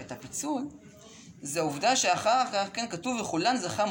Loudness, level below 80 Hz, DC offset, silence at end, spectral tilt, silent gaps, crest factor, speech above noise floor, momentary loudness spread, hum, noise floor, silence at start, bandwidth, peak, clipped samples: -28 LUFS; -68 dBFS; under 0.1%; 0 s; -2.5 dB/octave; none; 16 dB; 22 dB; 11 LU; none; -50 dBFS; 0 s; 17 kHz; -14 dBFS; under 0.1%